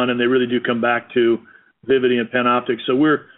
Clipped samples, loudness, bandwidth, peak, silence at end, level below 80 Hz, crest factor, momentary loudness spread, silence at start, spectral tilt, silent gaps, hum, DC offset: under 0.1%; -18 LUFS; 4.1 kHz; -4 dBFS; 0.15 s; -64 dBFS; 14 dB; 3 LU; 0 s; -3.5 dB/octave; none; none; under 0.1%